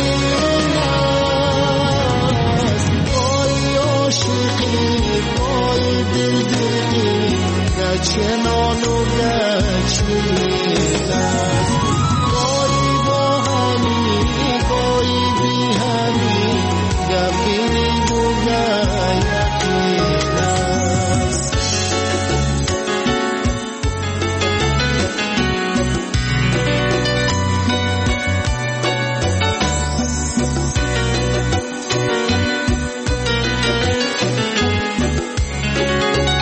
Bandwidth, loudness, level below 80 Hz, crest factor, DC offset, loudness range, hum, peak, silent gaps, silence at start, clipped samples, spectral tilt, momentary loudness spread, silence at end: 8.8 kHz; -17 LUFS; -28 dBFS; 12 dB; under 0.1%; 2 LU; none; -4 dBFS; none; 0 s; under 0.1%; -4.5 dB/octave; 3 LU; 0 s